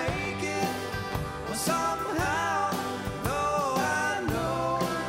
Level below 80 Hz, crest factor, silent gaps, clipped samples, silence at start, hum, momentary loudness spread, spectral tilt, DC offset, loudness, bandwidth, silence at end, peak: -46 dBFS; 14 dB; none; under 0.1%; 0 s; none; 6 LU; -4 dB/octave; under 0.1%; -29 LUFS; 16 kHz; 0 s; -14 dBFS